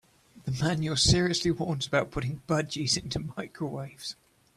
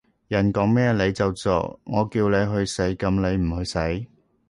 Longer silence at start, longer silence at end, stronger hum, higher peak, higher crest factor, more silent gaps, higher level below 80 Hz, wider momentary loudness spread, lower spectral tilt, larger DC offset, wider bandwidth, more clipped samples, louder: about the same, 0.35 s vs 0.3 s; about the same, 0.45 s vs 0.45 s; neither; about the same, -10 dBFS vs -8 dBFS; about the same, 20 dB vs 16 dB; neither; second, -48 dBFS vs -40 dBFS; first, 15 LU vs 7 LU; second, -4 dB/octave vs -6.5 dB/octave; neither; first, 14 kHz vs 11.5 kHz; neither; second, -28 LUFS vs -23 LUFS